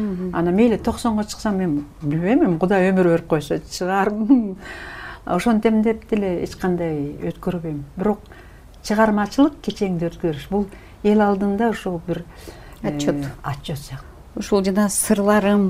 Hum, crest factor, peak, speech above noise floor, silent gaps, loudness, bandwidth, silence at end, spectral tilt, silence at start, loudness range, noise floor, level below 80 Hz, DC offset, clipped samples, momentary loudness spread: none; 18 dB; -2 dBFS; 22 dB; none; -20 LUFS; 16 kHz; 0 s; -6 dB/octave; 0 s; 4 LU; -41 dBFS; -42 dBFS; under 0.1%; under 0.1%; 13 LU